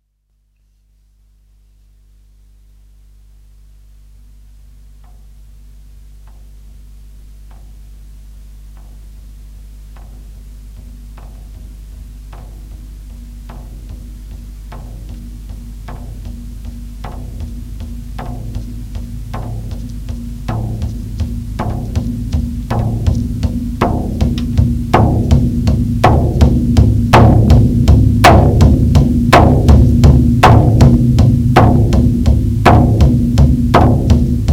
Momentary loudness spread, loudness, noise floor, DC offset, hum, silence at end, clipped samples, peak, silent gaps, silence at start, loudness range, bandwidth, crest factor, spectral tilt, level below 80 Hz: 25 LU; -11 LUFS; -60 dBFS; under 0.1%; 50 Hz at -25 dBFS; 0 s; 0.4%; 0 dBFS; none; 6.15 s; 24 LU; 15.5 kHz; 14 dB; -7.5 dB/octave; -20 dBFS